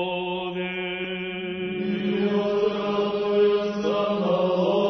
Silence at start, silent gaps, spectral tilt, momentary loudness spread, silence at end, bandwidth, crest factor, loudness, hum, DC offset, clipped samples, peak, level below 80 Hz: 0 s; none; -7 dB/octave; 8 LU; 0 s; 6.2 kHz; 14 dB; -25 LUFS; none; under 0.1%; under 0.1%; -10 dBFS; -60 dBFS